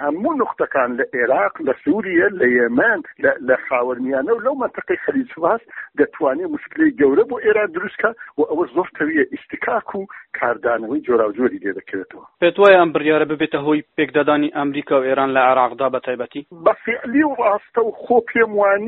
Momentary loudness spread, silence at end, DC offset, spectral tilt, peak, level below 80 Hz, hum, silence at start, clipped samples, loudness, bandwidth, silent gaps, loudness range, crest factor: 8 LU; 0 s; under 0.1%; -3.5 dB/octave; 0 dBFS; -60 dBFS; none; 0 s; under 0.1%; -18 LUFS; 4.2 kHz; none; 4 LU; 18 dB